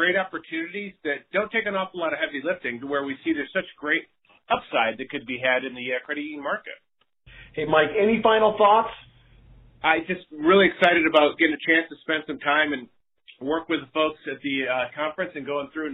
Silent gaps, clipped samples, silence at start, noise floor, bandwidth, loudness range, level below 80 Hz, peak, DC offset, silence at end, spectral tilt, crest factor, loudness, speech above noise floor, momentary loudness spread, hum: none; under 0.1%; 0 s; -54 dBFS; 4.9 kHz; 7 LU; -60 dBFS; -4 dBFS; under 0.1%; 0 s; -2 dB/octave; 20 dB; -24 LUFS; 31 dB; 13 LU; none